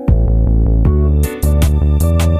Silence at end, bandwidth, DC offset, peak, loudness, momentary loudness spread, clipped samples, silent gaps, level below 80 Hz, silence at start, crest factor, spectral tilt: 0 s; 15.5 kHz; under 0.1%; 0 dBFS; -14 LUFS; 2 LU; under 0.1%; none; -12 dBFS; 0 s; 10 dB; -7.5 dB/octave